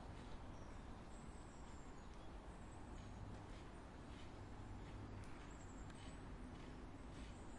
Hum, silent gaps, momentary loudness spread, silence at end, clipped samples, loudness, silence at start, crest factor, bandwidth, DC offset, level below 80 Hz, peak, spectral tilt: none; none; 3 LU; 0 s; under 0.1%; -57 LUFS; 0 s; 14 dB; 11 kHz; under 0.1%; -58 dBFS; -42 dBFS; -6 dB/octave